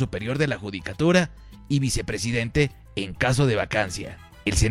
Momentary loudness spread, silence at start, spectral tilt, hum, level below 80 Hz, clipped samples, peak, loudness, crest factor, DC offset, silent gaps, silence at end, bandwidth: 11 LU; 0 s; -5 dB/octave; none; -38 dBFS; under 0.1%; -2 dBFS; -24 LUFS; 22 dB; under 0.1%; none; 0 s; 15 kHz